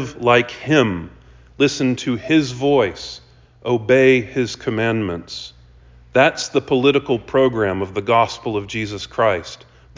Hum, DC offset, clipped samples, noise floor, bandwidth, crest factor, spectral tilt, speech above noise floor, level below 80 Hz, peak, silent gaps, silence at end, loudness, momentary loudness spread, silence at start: none; under 0.1%; under 0.1%; -46 dBFS; 7.6 kHz; 18 dB; -5.5 dB/octave; 28 dB; -46 dBFS; -2 dBFS; none; 0.4 s; -18 LUFS; 14 LU; 0 s